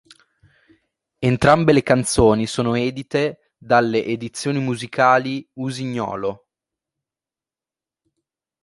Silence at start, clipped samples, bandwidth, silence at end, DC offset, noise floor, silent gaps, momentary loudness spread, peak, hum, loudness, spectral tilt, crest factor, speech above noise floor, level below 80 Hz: 1.2 s; under 0.1%; 11.5 kHz; 2.25 s; under 0.1%; under -90 dBFS; none; 11 LU; -2 dBFS; none; -19 LUFS; -5.5 dB/octave; 20 dB; over 71 dB; -44 dBFS